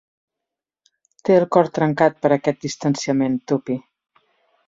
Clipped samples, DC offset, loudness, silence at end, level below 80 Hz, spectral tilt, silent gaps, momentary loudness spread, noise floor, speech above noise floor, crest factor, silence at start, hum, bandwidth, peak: under 0.1%; under 0.1%; -20 LUFS; 0.9 s; -62 dBFS; -6 dB/octave; none; 9 LU; -85 dBFS; 67 dB; 20 dB; 1.25 s; none; 7.8 kHz; -2 dBFS